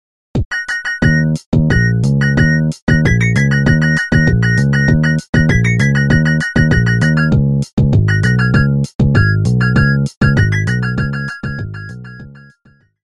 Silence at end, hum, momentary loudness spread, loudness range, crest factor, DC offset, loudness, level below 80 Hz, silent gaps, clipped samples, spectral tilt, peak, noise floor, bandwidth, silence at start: 0.7 s; none; 8 LU; 2 LU; 12 dB; under 0.1%; -13 LUFS; -26 dBFS; 0.45-0.51 s, 1.46-1.52 s, 2.82-2.87 s, 5.29-5.33 s, 7.73-7.77 s, 8.95-8.99 s, 10.17-10.21 s; under 0.1%; -7 dB/octave; 0 dBFS; -51 dBFS; 11 kHz; 0.35 s